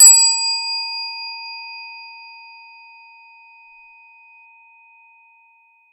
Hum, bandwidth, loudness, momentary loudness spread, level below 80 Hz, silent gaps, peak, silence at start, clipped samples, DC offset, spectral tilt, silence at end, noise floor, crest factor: none; 16 kHz; -15 LUFS; 28 LU; under -90 dBFS; none; 0 dBFS; 0 s; under 0.1%; under 0.1%; 13.5 dB/octave; 3.8 s; -55 dBFS; 20 dB